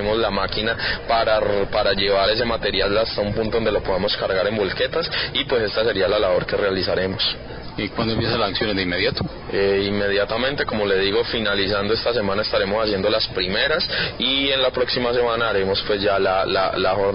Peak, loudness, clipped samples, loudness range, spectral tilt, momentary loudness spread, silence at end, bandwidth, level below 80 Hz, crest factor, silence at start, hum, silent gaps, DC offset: -8 dBFS; -20 LUFS; under 0.1%; 2 LU; -9 dB/octave; 3 LU; 0 s; 5.6 kHz; -40 dBFS; 14 dB; 0 s; none; none; under 0.1%